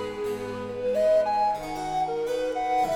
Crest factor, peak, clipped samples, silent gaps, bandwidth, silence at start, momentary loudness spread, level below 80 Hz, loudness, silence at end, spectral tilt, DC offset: 12 dB; -14 dBFS; under 0.1%; none; 17 kHz; 0 s; 9 LU; -52 dBFS; -26 LUFS; 0 s; -5 dB/octave; under 0.1%